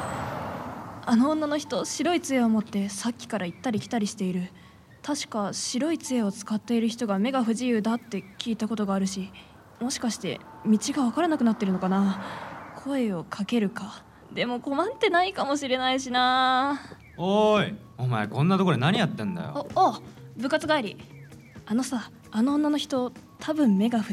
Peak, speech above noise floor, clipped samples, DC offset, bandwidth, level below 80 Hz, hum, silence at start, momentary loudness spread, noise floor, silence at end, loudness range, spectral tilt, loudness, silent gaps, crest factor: -10 dBFS; 20 dB; under 0.1%; under 0.1%; 14.5 kHz; -64 dBFS; none; 0 s; 14 LU; -46 dBFS; 0 s; 5 LU; -5 dB/octave; -26 LUFS; none; 18 dB